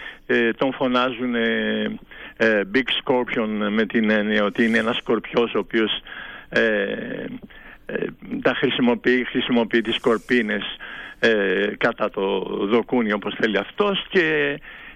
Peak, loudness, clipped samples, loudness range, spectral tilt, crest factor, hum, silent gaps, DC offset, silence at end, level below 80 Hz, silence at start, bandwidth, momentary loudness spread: -8 dBFS; -21 LUFS; under 0.1%; 3 LU; -6 dB/octave; 14 dB; none; none; under 0.1%; 0 s; -52 dBFS; 0 s; 10 kHz; 10 LU